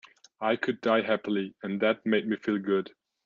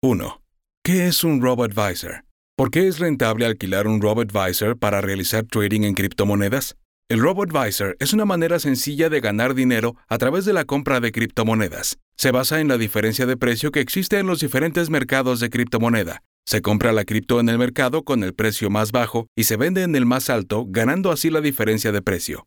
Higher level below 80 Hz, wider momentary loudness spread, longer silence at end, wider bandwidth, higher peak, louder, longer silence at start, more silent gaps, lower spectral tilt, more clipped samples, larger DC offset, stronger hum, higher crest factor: second, -74 dBFS vs -50 dBFS; about the same, 6 LU vs 5 LU; first, 0.4 s vs 0.05 s; second, 7.2 kHz vs over 20 kHz; second, -10 dBFS vs -2 dBFS; second, -28 LUFS vs -20 LUFS; first, 0.4 s vs 0.05 s; second, none vs 0.77-0.82 s, 2.31-2.57 s, 6.85-7.02 s, 12.02-12.12 s, 16.25-16.43 s, 19.28-19.36 s; first, -7 dB/octave vs -5 dB/octave; neither; neither; neither; about the same, 18 dB vs 18 dB